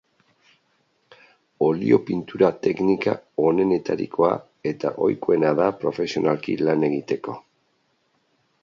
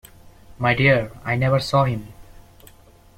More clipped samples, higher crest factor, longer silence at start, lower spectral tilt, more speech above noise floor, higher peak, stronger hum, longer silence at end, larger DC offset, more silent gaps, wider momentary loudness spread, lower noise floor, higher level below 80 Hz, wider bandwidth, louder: neither; about the same, 20 dB vs 18 dB; first, 1.6 s vs 0.5 s; about the same, -7.5 dB/octave vs -6.5 dB/octave; first, 47 dB vs 30 dB; about the same, -2 dBFS vs -4 dBFS; neither; first, 1.25 s vs 0.95 s; neither; neither; about the same, 8 LU vs 8 LU; first, -68 dBFS vs -49 dBFS; second, -62 dBFS vs -46 dBFS; second, 7.4 kHz vs 15 kHz; about the same, -22 LUFS vs -20 LUFS